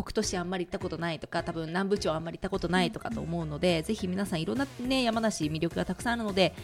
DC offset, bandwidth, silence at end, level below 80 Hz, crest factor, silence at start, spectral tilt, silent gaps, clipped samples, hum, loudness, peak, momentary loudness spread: under 0.1%; 16 kHz; 0 s; -50 dBFS; 20 dB; 0 s; -5 dB/octave; none; under 0.1%; none; -30 LUFS; -10 dBFS; 6 LU